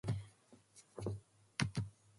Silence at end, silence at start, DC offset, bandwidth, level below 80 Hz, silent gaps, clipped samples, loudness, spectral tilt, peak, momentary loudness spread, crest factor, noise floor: 0.25 s; 0.05 s; under 0.1%; 11.5 kHz; -62 dBFS; none; under 0.1%; -44 LUFS; -5.5 dB/octave; -14 dBFS; 20 LU; 30 dB; -66 dBFS